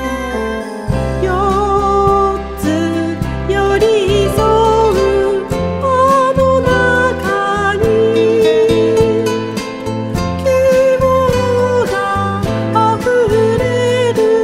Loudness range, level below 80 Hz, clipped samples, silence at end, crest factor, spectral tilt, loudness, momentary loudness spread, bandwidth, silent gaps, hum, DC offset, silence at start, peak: 2 LU; -28 dBFS; under 0.1%; 0 s; 12 dB; -6 dB/octave; -13 LUFS; 8 LU; 15.5 kHz; none; none; under 0.1%; 0 s; 0 dBFS